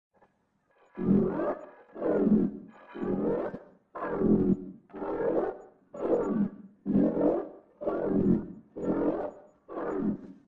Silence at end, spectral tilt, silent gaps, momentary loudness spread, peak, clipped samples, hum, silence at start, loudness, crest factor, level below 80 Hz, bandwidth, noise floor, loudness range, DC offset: 0.15 s; -11 dB/octave; none; 18 LU; -12 dBFS; under 0.1%; none; 0.95 s; -30 LUFS; 18 dB; -56 dBFS; 3.7 kHz; -72 dBFS; 1 LU; under 0.1%